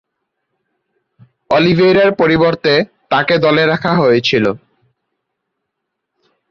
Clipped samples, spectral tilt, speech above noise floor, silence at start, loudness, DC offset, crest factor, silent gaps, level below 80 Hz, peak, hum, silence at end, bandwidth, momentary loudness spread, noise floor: under 0.1%; -6.5 dB/octave; 64 dB; 1.5 s; -12 LUFS; under 0.1%; 14 dB; none; -50 dBFS; -2 dBFS; none; 1.95 s; 7 kHz; 6 LU; -75 dBFS